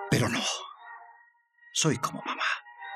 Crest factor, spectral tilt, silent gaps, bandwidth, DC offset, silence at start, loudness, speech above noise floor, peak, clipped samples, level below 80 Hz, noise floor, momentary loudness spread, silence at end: 20 dB; -3.5 dB/octave; none; 14 kHz; under 0.1%; 0 s; -29 LUFS; 32 dB; -12 dBFS; under 0.1%; -66 dBFS; -61 dBFS; 20 LU; 0 s